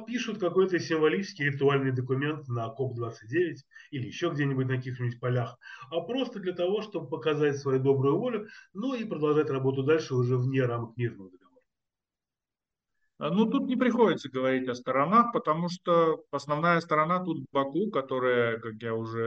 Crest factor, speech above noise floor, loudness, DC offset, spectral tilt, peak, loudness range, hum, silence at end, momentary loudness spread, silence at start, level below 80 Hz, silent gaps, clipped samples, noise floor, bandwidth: 18 dB; over 62 dB; -28 LUFS; under 0.1%; -7 dB/octave; -10 dBFS; 6 LU; none; 0 s; 10 LU; 0 s; -74 dBFS; none; under 0.1%; under -90 dBFS; 7.8 kHz